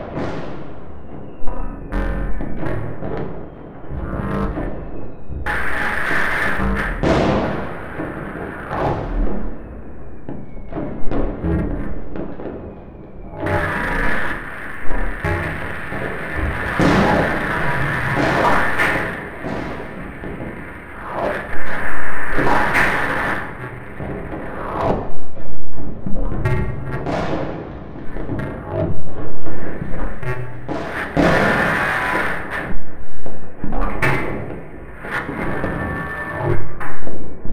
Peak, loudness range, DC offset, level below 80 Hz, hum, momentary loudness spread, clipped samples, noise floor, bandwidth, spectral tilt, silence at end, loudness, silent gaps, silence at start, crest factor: -2 dBFS; 8 LU; under 0.1%; -30 dBFS; none; 17 LU; under 0.1%; -35 dBFS; 14 kHz; -6.5 dB/octave; 0 s; -22 LUFS; none; 0 s; 12 dB